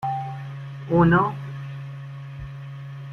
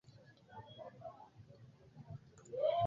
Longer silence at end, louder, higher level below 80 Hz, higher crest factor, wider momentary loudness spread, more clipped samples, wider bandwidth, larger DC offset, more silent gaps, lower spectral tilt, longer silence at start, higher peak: about the same, 0 s vs 0 s; first, -23 LUFS vs -46 LUFS; first, -48 dBFS vs -74 dBFS; about the same, 18 dB vs 20 dB; about the same, 19 LU vs 20 LU; neither; second, 6 kHz vs 7.4 kHz; neither; neither; first, -9.5 dB/octave vs -5 dB/octave; second, 0 s vs 0.3 s; first, -6 dBFS vs -24 dBFS